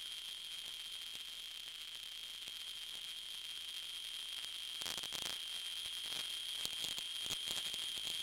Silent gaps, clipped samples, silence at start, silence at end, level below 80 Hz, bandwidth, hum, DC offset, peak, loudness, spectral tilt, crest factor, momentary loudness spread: none; under 0.1%; 0 s; 0 s; -74 dBFS; 17 kHz; none; under 0.1%; -14 dBFS; -42 LUFS; 1 dB/octave; 30 dB; 6 LU